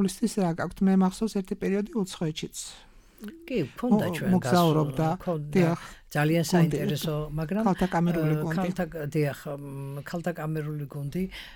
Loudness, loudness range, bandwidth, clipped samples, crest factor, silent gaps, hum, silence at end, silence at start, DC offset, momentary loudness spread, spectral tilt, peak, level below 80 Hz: -27 LUFS; 4 LU; 17.5 kHz; under 0.1%; 18 dB; none; none; 0 s; 0 s; under 0.1%; 12 LU; -6.5 dB/octave; -10 dBFS; -52 dBFS